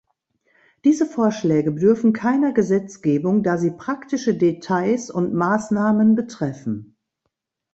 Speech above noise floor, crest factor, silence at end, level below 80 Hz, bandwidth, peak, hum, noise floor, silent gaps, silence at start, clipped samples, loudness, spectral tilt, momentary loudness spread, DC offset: 58 dB; 16 dB; 0.9 s; -62 dBFS; 8 kHz; -4 dBFS; none; -77 dBFS; none; 0.85 s; under 0.1%; -20 LUFS; -7 dB/octave; 9 LU; under 0.1%